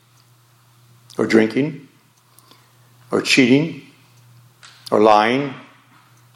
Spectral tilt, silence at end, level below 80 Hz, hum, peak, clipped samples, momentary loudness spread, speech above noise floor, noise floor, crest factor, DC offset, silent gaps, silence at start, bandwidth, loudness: -5 dB/octave; 0.75 s; -68 dBFS; none; 0 dBFS; under 0.1%; 25 LU; 38 dB; -53 dBFS; 20 dB; under 0.1%; none; 1.2 s; 15 kHz; -17 LUFS